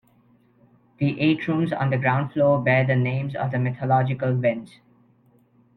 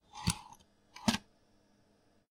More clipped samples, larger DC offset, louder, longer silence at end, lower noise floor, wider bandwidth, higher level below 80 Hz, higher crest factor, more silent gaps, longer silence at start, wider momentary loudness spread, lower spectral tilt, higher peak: neither; neither; first, -22 LUFS vs -36 LUFS; about the same, 1.1 s vs 1.1 s; second, -59 dBFS vs -70 dBFS; second, 4.6 kHz vs 16 kHz; about the same, -60 dBFS vs -58 dBFS; second, 16 dB vs 26 dB; neither; first, 1 s vs 0.15 s; second, 7 LU vs 22 LU; first, -9.5 dB/octave vs -3.5 dB/octave; first, -6 dBFS vs -14 dBFS